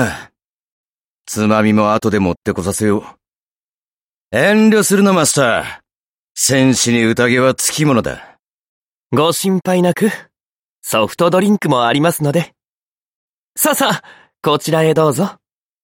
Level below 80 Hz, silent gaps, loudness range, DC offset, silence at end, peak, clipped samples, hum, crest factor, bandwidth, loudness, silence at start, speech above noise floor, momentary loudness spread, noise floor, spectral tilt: -50 dBFS; 0.46-1.25 s, 2.37-2.42 s, 3.36-4.30 s, 5.96-6.35 s, 8.39-9.10 s, 10.43-10.82 s, 12.68-13.55 s; 4 LU; under 0.1%; 0.5 s; -2 dBFS; under 0.1%; none; 14 dB; 16.5 kHz; -14 LUFS; 0 s; over 76 dB; 11 LU; under -90 dBFS; -4.5 dB/octave